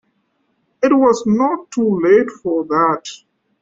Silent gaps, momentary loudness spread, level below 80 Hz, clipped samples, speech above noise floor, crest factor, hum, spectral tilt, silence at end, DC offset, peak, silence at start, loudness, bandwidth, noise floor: none; 8 LU; -58 dBFS; under 0.1%; 50 dB; 14 dB; none; -6 dB/octave; 0.45 s; under 0.1%; -2 dBFS; 0.8 s; -16 LUFS; 7.8 kHz; -65 dBFS